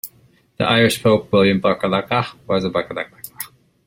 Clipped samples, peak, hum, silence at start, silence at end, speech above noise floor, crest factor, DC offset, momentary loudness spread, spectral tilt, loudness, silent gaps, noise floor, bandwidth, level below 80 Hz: under 0.1%; 0 dBFS; none; 0.05 s; 0.4 s; 35 dB; 18 dB; under 0.1%; 17 LU; -5 dB/octave; -18 LUFS; none; -53 dBFS; 16.5 kHz; -52 dBFS